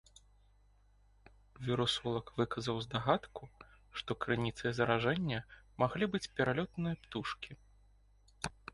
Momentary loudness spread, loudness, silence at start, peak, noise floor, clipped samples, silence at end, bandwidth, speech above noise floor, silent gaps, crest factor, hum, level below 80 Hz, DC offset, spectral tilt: 13 LU; -36 LUFS; 1.6 s; -14 dBFS; -67 dBFS; under 0.1%; 0.25 s; 11.5 kHz; 31 dB; none; 24 dB; 50 Hz at -60 dBFS; -60 dBFS; under 0.1%; -5.5 dB/octave